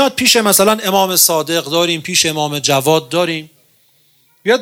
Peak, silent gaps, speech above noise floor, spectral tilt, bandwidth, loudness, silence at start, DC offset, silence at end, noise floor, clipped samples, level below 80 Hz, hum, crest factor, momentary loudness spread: 0 dBFS; none; 40 dB; -2.5 dB/octave; over 20 kHz; -13 LUFS; 0 s; under 0.1%; 0 s; -54 dBFS; under 0.1%; -60 dBFS; none; 14 dB; 7 LU